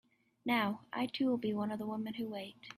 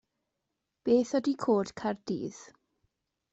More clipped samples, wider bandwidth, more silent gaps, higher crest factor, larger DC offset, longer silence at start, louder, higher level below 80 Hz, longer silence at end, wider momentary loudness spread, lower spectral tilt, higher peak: neither; first, 15 kHz vs 8.2 kHz; neither; about the same, 18 dB vs 18 dB; neither; second, 0.45 s vs 0.85 s; second, -37 LUFS vs -30 LUFS; second, -78 dBFS vs -70 dBFS; second, 0.05 s vs 0.9 s; second, 9 LU vs 12 LU; about the same, -6 dB/octave vs -6 dB/octave; second, -20 dBFS vs -14 dBFS